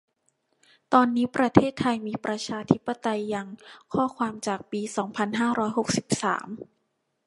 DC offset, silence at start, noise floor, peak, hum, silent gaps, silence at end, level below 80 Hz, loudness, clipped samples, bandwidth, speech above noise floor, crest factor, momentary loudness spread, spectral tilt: under 0.1%; 0.9 s; -75 dBFS; 0 dBFS; none; none; 0.6 s; -58 dBFS; -26 LUFS; under 0.1%; 11.5 kHz; 50 dB; 26 dB; 10 LU; -5 dB/octave